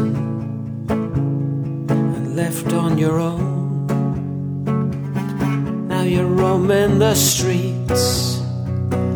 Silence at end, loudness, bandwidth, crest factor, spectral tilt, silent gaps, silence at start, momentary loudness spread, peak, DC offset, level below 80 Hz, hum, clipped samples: 0 s; -19 LUFS; over 20 kHz; 16 dB; -5.5 dB/octave; none; 0 s; 9 LU; -4 dBFS; under 0.1%; -42 dBFS; none; under 0.1%